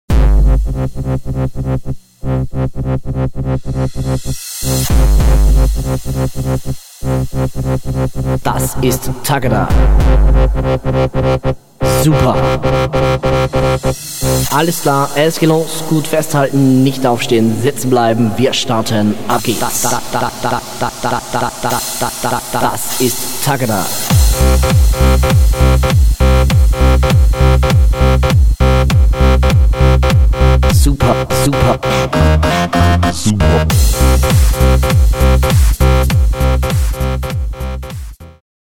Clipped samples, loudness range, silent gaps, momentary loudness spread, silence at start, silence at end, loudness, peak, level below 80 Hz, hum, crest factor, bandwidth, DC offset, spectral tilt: under 0.1%; 6 LU; none; 8 LU; 0.1 s; 0.2 s; -13 LUFS; 0 dBFS; -14 dBFS; none; 12 dB; 18 kHz; 1%; -5.5 dB/octave